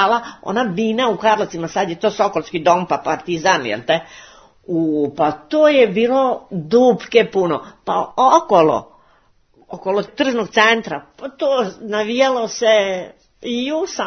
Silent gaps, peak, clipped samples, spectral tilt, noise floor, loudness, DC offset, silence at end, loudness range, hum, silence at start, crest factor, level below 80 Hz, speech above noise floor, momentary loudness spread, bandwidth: none; 0 dBFS; under 0.1%; -4.5 dB/octave; -56 dBFS; -17 LUFS; under 0.1%; 0 s; 3 LU; none; 0 s; 18 dB; -58 dBFS; 39 dB; 10 LU; 6.6 kHz